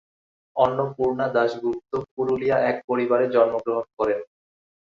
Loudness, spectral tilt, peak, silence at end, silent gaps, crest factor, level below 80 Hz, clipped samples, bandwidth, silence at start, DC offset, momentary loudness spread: -23 LUFS; -7.5 dB/octave; -4 dBFS; 0.7 s; 2.11-2.17 s, 2.84-2.88 s, 3.93-3.97 s; 20 dB; -60 dBFS; under 0.1%; 7.2 kHz; 0.55 s; under 0.1%; 8 LU